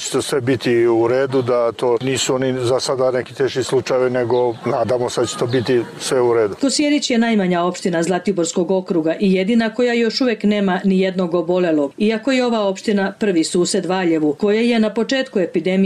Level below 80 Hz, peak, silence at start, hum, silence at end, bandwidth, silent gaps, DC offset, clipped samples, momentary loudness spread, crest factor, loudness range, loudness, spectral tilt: -58 dBFS; -8 dBFS; 0 s; none; 0 s; 13.5 kHz; none; under 0.1%; under 0.1%; 4 LU; 10 dB; 1 LU; -17 LUFS; -5 dB/octave